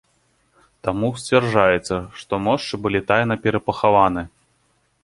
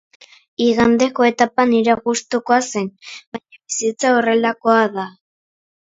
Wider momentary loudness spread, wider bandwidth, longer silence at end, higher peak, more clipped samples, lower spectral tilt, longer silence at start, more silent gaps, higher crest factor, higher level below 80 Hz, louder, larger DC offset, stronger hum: second, 11 LU vs 17 LU; first, 11.5 kHz vs 8 kHz; about the same, 0.75 s vs 0.75 s; about the same, -2 dBFS vs 0 dBFS; neither; first, -6 dB/octave vs -3.5 dB/octave; first, 0.85 s vs 0.6 s; second, none vs 3.27-3.32 s; about the same, 20 dB vs 18 dB; first, -48 dBFS vs -54 dBFS; second, -20 LUFS vs -17 LUFS; neither; neither